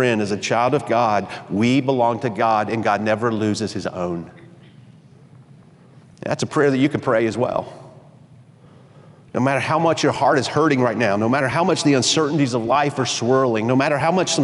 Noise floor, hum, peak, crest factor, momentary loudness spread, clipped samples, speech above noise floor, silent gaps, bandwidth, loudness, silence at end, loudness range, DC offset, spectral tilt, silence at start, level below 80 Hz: -47 dBFS; none; -6 dBFS; 14 dB; 9 LU; under 0.1%; 29 dB; none; 11.5 kHz; -19 LUFS; 0 s; 7 LU; under 0.1%; -5 dB/octave; 0 s; -60 dBFS